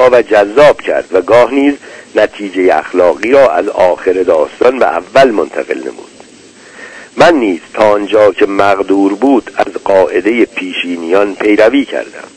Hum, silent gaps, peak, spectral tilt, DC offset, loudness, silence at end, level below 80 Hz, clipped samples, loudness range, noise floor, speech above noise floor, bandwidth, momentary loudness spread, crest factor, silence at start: none; none; 0 dBFS; -5 dB/octave; under 0.1%; -10 LUFS; 0.1 s; -46 dBFS; 3%; 3 LU; -37 dBFS; 28 dB; 11 kHz; 9 LU; 10 dB; 0 s